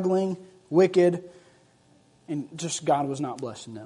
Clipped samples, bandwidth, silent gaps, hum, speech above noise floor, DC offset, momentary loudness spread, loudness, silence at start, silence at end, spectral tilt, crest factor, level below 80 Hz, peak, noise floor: under 0.1%; 11 kHz; none; none; 35 dB; under 0.1%; 15 LU; -26 LUFS; 0 s; 0 s; -5.5 dB/octave; 18 dB; -72 dBFS; -8 dBFS; -60 dBFS